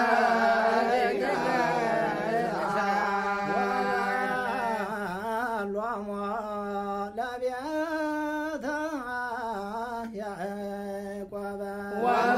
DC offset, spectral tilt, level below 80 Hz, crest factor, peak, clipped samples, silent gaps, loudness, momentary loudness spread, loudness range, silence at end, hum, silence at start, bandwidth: under 0.1%; -5 dB/octave; -60 dBFS; 18 dB; -10 dBFS; under 0.1%; none; -29 LUFS; 11 LU; 7 LU; 0 s; none; 0 s; 15.5 kHz